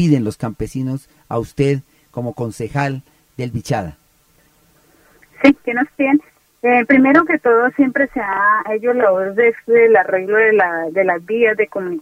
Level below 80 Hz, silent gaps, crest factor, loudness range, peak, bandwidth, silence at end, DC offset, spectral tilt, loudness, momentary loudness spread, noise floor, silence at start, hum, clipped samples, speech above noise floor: -48 dBFS; none; 16 dB; 9 LU; 0 dBFS; 15 kHz; 0 s; under 0.1%; -7.5 dB/octave; -16 LUFS; 13 LU; -55 dBFS; 0 s; none; under 0.1%; 40 dB